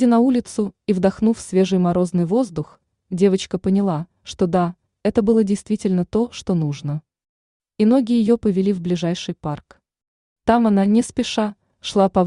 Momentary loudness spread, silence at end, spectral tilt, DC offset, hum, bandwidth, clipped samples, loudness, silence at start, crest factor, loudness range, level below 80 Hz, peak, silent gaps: 11 LU; 0 s; -7 dB/octave; under 0.1%; none; 11 kHz; under 0.1%; -20 LUFS; 0 s; 16 dB; 1 LU; -50 dBFS; -4 dBFS; 7.29-7.60 s, 10.07-10.36 s